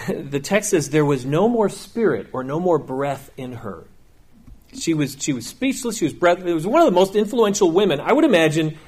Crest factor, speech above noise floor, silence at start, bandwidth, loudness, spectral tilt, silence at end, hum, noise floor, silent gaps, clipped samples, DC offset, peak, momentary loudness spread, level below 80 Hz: 16 dB; 29 dB; 0 s; 15.5 kHz; -19 LUFS; -5 dB/octave; 0.05 s; none; -48 dBFS; none; under 0.1%; under 0.1%; -4 dBFS; 11 LU; -52 dBFS